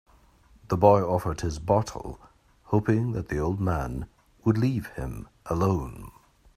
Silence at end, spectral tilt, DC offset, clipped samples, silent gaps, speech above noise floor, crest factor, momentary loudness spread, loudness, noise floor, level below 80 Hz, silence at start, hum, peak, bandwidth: 0.45 s; -8 dB/octave; under 0.1%; under 0.1%; none; 32 dB; 24 dB; 18 LU; -26 LUFS; -57 dBFS; -44 dBFS; 0.7 s; none; -4 dBFS; 15 kHz